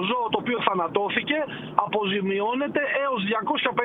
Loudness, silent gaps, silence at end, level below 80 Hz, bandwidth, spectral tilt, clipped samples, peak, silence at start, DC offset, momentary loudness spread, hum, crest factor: -25 LUFS; none; 0 s; -66 dBFS; 4.1 kHz; -8 dB/octave; under 0.1%; -2 dBFS; 0 s; under 0.1%; 2 LU; none; 24 dB